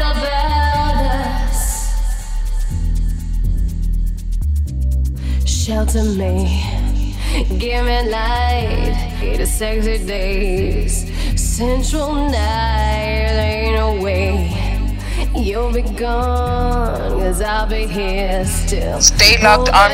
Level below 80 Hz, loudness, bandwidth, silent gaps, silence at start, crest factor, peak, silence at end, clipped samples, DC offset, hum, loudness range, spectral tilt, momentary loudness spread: -18 dBFS; -17 LUFS; 16 kHz; none; 0 s; 16 dB; 0 dBFS; 0 s; under 0.1%; under 0.1%; none; 4 LU; -4 dB/octave; 6 LU